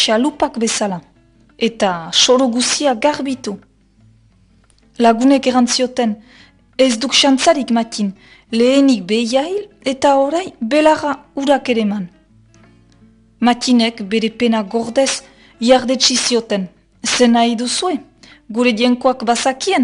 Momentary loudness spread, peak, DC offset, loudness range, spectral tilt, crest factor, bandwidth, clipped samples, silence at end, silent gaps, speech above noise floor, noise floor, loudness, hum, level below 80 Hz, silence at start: 11 LU; 0 dBFS; under 0.1%; 3 LU; -3 dB/octave; 16 dB; 11 kHz; under 0.1%; 0 s; none; 37 dB; -52 dBFS; -15 LUFS; none; -54 dBFS; 0 s